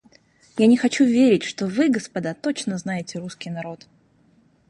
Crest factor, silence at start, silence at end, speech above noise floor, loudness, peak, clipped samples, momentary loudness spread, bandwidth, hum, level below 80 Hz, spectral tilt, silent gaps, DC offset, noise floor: 18 dB; 0.55 s; 0.95 s; 38 dB; -21 LUFS; -4 dBFS; under 0.1%; 16 LU; 11 kHz; none; -66 dBFS; -5.5 dB/octave; none; under 0.1%; -59 dBFS